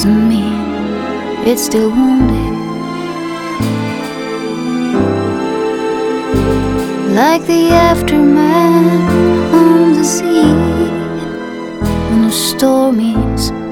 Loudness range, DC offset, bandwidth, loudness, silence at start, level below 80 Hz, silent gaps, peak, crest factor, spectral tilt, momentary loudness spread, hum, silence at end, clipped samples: 7 LU; under 0.1%; 19 kHz; -13 LUFS; 0 s; -30 dBFS; none; 0 dBFS; 12 dB; -5.5 dB/octave; 11 LU; none; 0 s; 0.1%